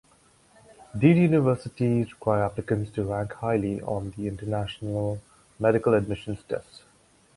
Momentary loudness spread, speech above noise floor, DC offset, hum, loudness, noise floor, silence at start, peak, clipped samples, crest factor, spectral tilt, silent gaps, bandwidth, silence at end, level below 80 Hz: 12 LU; 35 dB; under 0.1%; none; -26 LUFS; -60 dBFS; 0.95 s; -6 dBFS; under 0.1%; 20 dB; -8.5 dB/octave; none; 11.5 kHz; 0.75 s; -52 dBFS